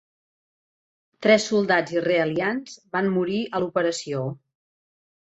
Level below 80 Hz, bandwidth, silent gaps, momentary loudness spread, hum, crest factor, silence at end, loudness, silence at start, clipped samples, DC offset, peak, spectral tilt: -68 dBFS; 8.2 kHz; none; 10 LU; none; 20 dB; 0.85 s; -23 LUFS; 1.2 s; under 0.1%; under 0.1%; -4 dBFS; -5 dB/octave